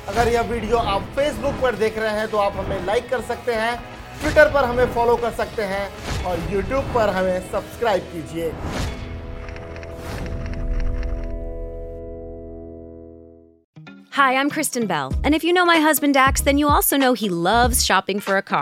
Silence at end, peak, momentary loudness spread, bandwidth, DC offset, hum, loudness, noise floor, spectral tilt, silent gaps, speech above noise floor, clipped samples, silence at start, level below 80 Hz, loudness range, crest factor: 0 s; -2 dBFS; 18 LU; 17 kHz; under 0.1%; none; -20 LUFS; -46 dBFS; -4 dB/octave; 13.64-13.73 s; 26 dB; under 0.1%; 0 s; -32 dBFS; 14 LU; 20 dB